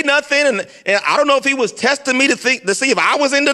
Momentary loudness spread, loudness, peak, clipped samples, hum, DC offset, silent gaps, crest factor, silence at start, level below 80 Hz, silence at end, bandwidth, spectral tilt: 3 LU; -14 LUFS; 0 dBFS; under 0.1%; none; under 0.1%; none; 14 dB; 0 s; -64 dBFS; 0 s; 12.5 kHz; -2 dB/octave